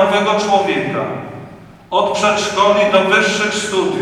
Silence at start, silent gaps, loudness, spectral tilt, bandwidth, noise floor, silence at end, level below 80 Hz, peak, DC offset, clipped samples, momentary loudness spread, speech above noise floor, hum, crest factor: 0 s; none; -15 LUFS; -3.5 dB/octave; 13 kHz; -37 dBFS; 0 s; -52 dBFS; 0 dBFS; under 0.1%; under 0.1%; 12 LU; 22 dB; none; 16 dB